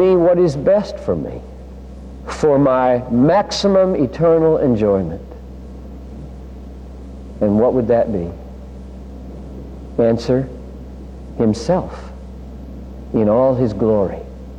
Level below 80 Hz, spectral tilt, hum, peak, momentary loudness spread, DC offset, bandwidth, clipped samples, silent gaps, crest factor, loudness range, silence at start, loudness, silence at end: -36 dBFS; -7.5 dB/octave; none; -4 dBFS; 21 LU; under 0.1%; 9.8 kHz; under 0.1%; none; 14 dB; 7 LU; 0 s; -16 LUFS; 0 s